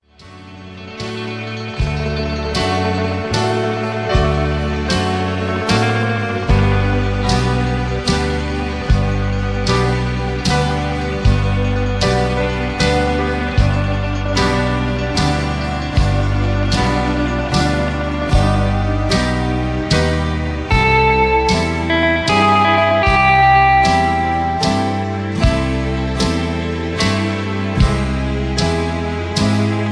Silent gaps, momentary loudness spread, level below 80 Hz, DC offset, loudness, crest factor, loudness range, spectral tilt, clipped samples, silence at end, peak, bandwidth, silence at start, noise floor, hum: none; 8 LU; -24 dBFS; 0.2%; -16 LUFS; 14 dB; 5 LU; -5.5 dB/octave; under 0.1%; 0 s; -2 dBFS; 11 kHz; 0.2 s; -39 dBFS; none